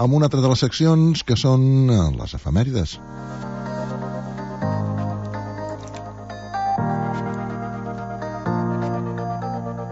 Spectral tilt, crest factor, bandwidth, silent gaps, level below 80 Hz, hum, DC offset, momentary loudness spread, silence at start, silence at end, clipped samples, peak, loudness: -7 dB/octave; 16 dB; 8 kHz; none; -40 dBFS; none; under 0.1%; 15 LU; 0 s; 0 s; under 0.1%; -4 dBFS; -22 LUFS